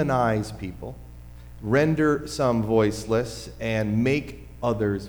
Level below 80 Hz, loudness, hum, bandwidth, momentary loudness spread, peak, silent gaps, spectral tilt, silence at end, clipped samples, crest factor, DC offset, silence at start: -44 dBFS; -24 LUFS; 60 Hz at -45 dBFS; over 20 kHz; 17 LU; -8 dBFS; none; -6.5 dB/octave; 0 s; under 0.1%; 16 dB; under 0.1%; 0 s